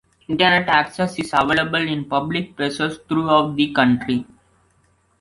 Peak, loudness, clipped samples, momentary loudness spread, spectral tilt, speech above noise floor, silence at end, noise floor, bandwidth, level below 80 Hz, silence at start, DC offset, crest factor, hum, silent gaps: -2 dBFS; -19 LUFS; under 0.1%; 9 LU; -5.5 dB/octave; 42 dB; 0.95 s; -61 dBFS; 11.5 kHz; -52 dBFS; 0.3 s; under 0.1%; 18 dB; none; none